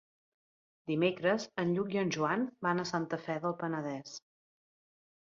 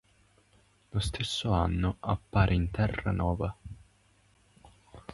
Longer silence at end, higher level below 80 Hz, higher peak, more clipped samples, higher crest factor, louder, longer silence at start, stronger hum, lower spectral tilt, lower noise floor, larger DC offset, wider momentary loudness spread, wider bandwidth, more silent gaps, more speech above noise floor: first, 1.05 s vs 0 s; second, -76 dBFS vs -40 dBFS; second, -16 dBFS vs -10 dBFS; neither; about the same, 18 dB vs 22 dB; second, -34 LUFS vs -30 LUFS; about the same, 0.85 s vs 0.95 s; second, none vs 50 Hz at -50 dBFS; about the same, -5.5 dB/octave vs -6 dB/octave; first, under -90 dBFS vs -65 dBFS; neither; second, 10 LU vs 18 LU; second, 7.6 kHz vs 11.5 kHz; neither; first, over 57 dB vs 36 dB